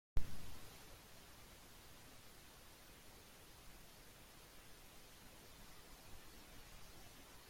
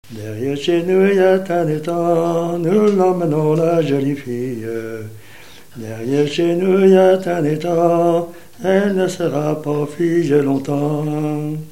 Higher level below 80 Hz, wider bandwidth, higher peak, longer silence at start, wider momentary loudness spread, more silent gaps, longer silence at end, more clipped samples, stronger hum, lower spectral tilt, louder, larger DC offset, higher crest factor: about the same, -56 dBFS vs -60 dBFS; about the same, 16.5 kHz vs 16.5 kHz; second, -22 dBFS vs 0 dBFS; about the same, 0.15 s vs 0.1 s; second, 4 LU vs 12 LU; neither; about the same, 0 s vs 0 s; neither; neither; second, -3.5 dB/octave vs -7 dB/octave; second, -59 LUFS vs -17 LUFS; second, under 0.1% vs 1%; first, 24 dB vs 16 dB